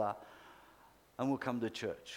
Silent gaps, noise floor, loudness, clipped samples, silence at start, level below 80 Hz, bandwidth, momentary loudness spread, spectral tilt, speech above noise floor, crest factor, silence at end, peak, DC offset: none; -64 dBFS; -39 LUFS; under 0.1%; 0 s; -74 dBFS; 18 kHz; 21 LU; -5.5 dB/octave; 26 dB; 20 dB; 0 s; -20 dBFS; under 0.1%